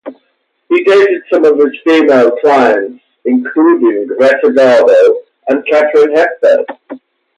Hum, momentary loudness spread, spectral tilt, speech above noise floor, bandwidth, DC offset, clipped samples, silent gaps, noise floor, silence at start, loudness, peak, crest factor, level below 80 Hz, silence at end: none; 8 LU; -5 dB/octave; 53 dB; 10 kHz; under 0.1%; under 0.1%; none; -61 dBFS; 0.05 s; -9 LUFS; 0 dBFS; 10 dB; -60 dBFS; 0.4 s